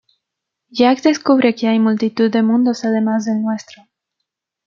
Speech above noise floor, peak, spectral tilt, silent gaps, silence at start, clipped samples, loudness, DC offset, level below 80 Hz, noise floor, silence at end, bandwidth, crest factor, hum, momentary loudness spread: 65 dB; -2 dBFS; -5.5 dB/octave; none; 0.75 s; under 0.1%; -16 LUFS; under 0.1%; -66 dBFS; -80 dBFS; 1.05 s; 7.4 kHz; 14 dB; none; 7 LU